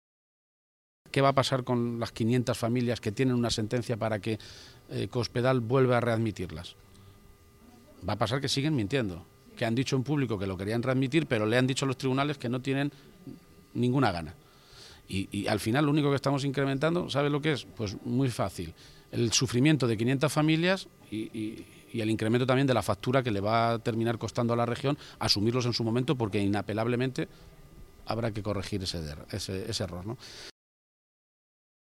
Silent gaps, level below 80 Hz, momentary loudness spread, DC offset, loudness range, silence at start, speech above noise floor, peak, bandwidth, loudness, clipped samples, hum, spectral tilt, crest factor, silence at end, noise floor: none; -56 dBFS; 14 LU; under 0.1%; 5 LU; 1.15 s; 27 dB; -10 dBFS; 15.5 kHz; -29 LUFS; under 0.1%; none; -5.5 dB/octave; 20 dB; 1.35 s; -56 dBFS